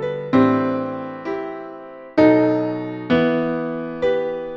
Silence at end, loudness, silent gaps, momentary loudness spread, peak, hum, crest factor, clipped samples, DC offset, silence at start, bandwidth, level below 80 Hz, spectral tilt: 0 s; -20 LUFS; none; 13 LU; -2 dBFS; none; 18 dB; under 0.1%; under 0.1%; 0 s; 6.6 kHz; -54 dBFS; -8.5 dB/octave